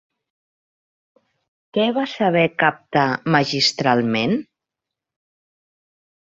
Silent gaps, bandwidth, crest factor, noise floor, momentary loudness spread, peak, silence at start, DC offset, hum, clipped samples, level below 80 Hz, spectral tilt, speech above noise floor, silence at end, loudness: none; 8 kHz; 20 dB; -85 dBFS; 5 LU; -2 dBFS; 1.75 s; under 0.1%; none; under 0.1%; -62 dBFS; -5 dB/octave; 66 dB; 1.85 s; -19 LUFS